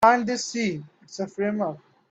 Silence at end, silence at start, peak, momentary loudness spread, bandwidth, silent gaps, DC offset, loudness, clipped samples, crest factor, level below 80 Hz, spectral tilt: 0.35 s; 0 s; -4 dBFS; 15 LU; 16 kHz; none; under 0.1%; -26 LUFS; under 0.1%; 20 dB; -66 dBFS; -4.5 dB/octave